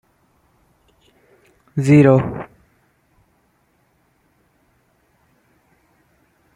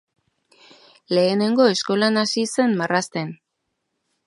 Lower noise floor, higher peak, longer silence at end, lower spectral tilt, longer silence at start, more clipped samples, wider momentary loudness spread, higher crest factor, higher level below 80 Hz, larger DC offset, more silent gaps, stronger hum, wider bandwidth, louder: second, -62 dBFS vs -77 dBFS; about the same, -2 dBFS vs -4 dBFS; first, 4.1 s vs 0.9 s; first, -8.5 dB/octave vs -4.5 dB/octave; first, 1.75 s vs 1.1 s; neither; first, 22 LU vs 9 LU; about the same, 20 dB vs 20 dB; first, -54 dBFS vs -72 dBFS; neither; neither; neither; about the same, 11 kHz vs 11.5 kHz; first, -15 LUFS vs -20 LUFS